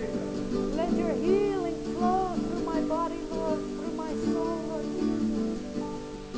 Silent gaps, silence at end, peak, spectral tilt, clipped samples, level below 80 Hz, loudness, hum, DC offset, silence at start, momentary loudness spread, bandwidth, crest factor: none; 0 s; -14 dBFS; -6.5 dB/octave; under 0.1%; -48 dBFS; -30 LUFS; none; under 0.1%; 0 s; 8 LU; 8 kHz; 14 dB